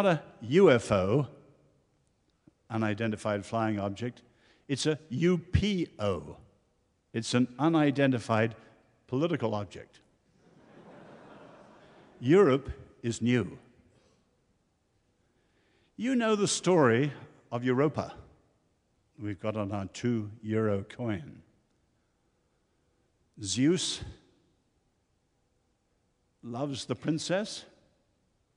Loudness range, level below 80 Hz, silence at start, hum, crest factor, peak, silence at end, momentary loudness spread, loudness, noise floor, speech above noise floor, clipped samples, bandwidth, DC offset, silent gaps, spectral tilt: 8 LU; -56 dBFS; 0 s; none; 24 dB; -8 dBFS; 0.9 s; 16 LU; -29 LUFS; -74 dBFS; 45 dB; under 0.1%; 11 kHz; under 0.1%; none; -5.5 dB/octave